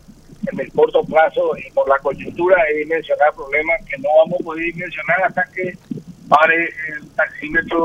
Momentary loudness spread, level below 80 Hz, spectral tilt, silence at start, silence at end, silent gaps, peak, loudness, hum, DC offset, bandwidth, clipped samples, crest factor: 11 LU; -48 dBFS; -6.5 dB/octave; 0.3 s; 0 s; none; 0 dBFS; -17 LUFS; none; under 0.1%; 8.6 kHz; under 0.1%; 18 dB